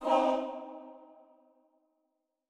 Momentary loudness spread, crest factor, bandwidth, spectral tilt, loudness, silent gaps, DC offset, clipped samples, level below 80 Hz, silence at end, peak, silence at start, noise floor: 24 LU; 20 dB; 11.5 kHz; -3.5 dB/octave; -31 LUFS; none; under 0.1%; under 0.1%; -78 dBFS; 1.45 s; -14 dBFS; 0 s; -82 dBFS